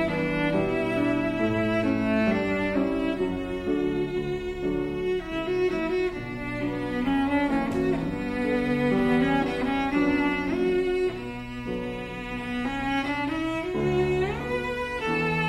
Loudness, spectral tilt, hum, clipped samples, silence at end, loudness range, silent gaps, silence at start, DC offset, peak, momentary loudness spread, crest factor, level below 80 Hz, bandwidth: -26 LUFS; -7 dB/octave; none; under 0.1%; 0 s; 3 LU; none; 0 s; under 0.1%; -12 dBFS; 7 LU; 14 dB; -44 dBFS; 13 kHz